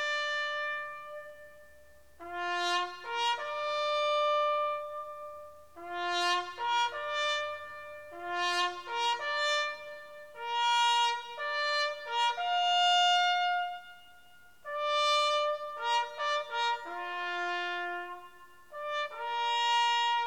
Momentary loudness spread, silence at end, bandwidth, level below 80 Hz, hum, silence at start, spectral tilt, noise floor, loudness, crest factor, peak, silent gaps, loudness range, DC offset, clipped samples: 17 LU; 0 s; 16.5 kHz; -74 dBFS; none; 0 s; 0 dB/octave; -60 dBFS; -30 LUFS; 16 dB; -16 dBFS; none; 6 LU; 0.1%; under 0.1%